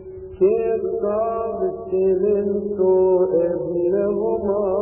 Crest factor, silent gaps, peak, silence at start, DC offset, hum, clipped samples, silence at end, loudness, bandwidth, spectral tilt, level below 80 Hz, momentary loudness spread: 12 dB; none; -6 dBFS; 0 s; under 0.1%; none; under 0.1%; 0 s; -20 LUFS; 2.9 kHz; -14 dB/octave; -50 dBFS; 6 LU